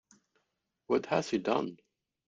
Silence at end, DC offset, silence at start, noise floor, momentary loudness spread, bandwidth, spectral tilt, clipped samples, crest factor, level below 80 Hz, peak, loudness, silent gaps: 0.55 s; under 0.1%; 0.9 s; -82 dBFS; 3 LU; 9.4 kHz; -5.5 dB/octave; under 0.1%; 22 dB; -72 dBFS; -14 dBFS; -32 LUFS; none